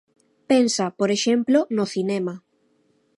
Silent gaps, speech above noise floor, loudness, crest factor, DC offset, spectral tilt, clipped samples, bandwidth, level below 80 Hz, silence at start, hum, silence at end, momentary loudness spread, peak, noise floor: none; 44 dB; -21 LUFS; 16 dB; under 0.1%; -4.5 dB/octave; under 0.1%; 11.5 kHz; -72 dBFS; 0.5 s; none; 0.8 s; 8 LU; -6 dBFS; -64 dBFS